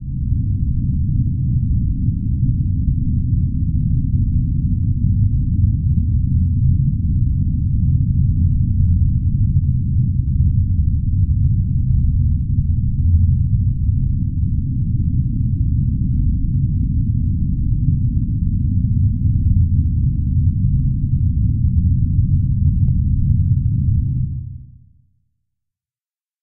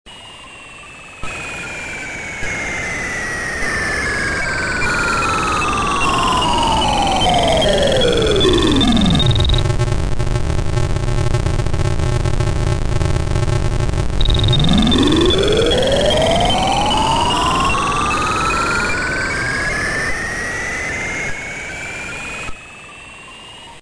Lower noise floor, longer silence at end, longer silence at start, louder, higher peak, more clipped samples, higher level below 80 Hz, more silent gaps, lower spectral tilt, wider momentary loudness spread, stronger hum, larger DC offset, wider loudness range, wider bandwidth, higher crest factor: first, under -90 dBFS vs -36 dBFS; first, 1.7 s vs 0 s; about the same, 0 s vs 0.05 s; about the same, -18 LUFS vs -16 LUFS; about the same, -4 dBFS vs -2 dBFS; neither; about the same, -22 dBFS vs -24 dBFS; neither; first, -20 dB/octave vs -4.5 dB/octave; second, 3 LU vs 13 LU; neither; neither; second, 2 LU vs 8 LU; second, 0.4 kHz vs 10.5 kHz; about the same, 12 dB vs 14 dB